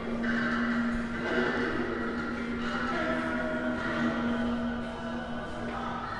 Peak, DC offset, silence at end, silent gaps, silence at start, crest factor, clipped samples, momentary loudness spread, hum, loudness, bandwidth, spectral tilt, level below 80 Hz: -16 dBFS; 0.1%; 0 s; none; 0 s; 14 dB; under 0.1%; 7 LU; none; -31 LUFS; 10.5 kHz; -6 dB/octave; -48 dBFS